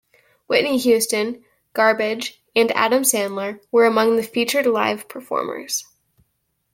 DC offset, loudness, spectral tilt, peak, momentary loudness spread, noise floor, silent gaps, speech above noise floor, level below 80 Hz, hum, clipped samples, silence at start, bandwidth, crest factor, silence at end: under 0.1%; -19 LUFS; -2.5 dB/octave; -2 dBFS; 11 LU; -71 dBFS; none; 52 dB; -68 dBFS; none; under 0.1%; 0.5 s; 17 kHz; 18 dB; 0.9 s